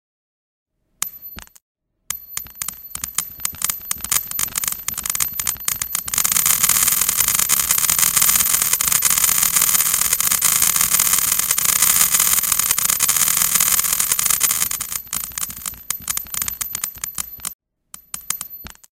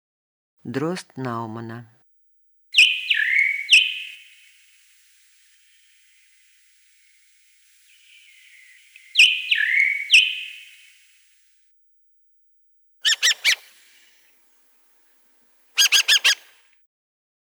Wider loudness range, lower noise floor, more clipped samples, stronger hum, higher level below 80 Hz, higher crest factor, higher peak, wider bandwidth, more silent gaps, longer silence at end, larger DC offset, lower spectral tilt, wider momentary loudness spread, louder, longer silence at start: first, 12 LU vs 5 LU; second, -45 dBFS vs -60 dBFS; neither; neither; first, -48 dBFS vs -84 dBFS; about the same, 20 dB vs 22 dB; about the same, 0 dBFS vs -2 dBFS; about the same, over 20 kHz vs over 20 kHz; first, 1.62-1.75 s, 17.54-17.59 s vs none; second, 0.3 s vs 1.05 s; neither; about the same, 1 dB/octave vs 0 dB/octave; second, 14 LU vs 19 LU; about the same, -16 LUFS vs -17 LUFS; first, 1 s vs 0.65 s